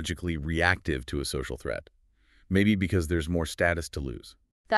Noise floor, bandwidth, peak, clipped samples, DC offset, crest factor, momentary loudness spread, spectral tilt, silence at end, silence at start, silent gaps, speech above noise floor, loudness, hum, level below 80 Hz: -62 dBFS; 13 kHz; -6 dBFS; under 0.1%; under 0.1%; 22 dB; 12 LU; -5.5 dB/octave; 0 s; 0 s; 4.52-4.64 s; 34 dB; -28 LUFS; none; -42 dBFS